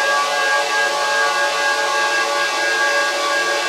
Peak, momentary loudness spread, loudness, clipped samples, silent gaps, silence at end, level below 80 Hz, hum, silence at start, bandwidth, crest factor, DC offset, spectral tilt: -6 dBFS; 1 LU; -16 LUFS; under 0.1%; none; 0 s; -86 dBFS; none; 0 s; 16 kHz; 12 dB; under 0.1%; 1 dB/octave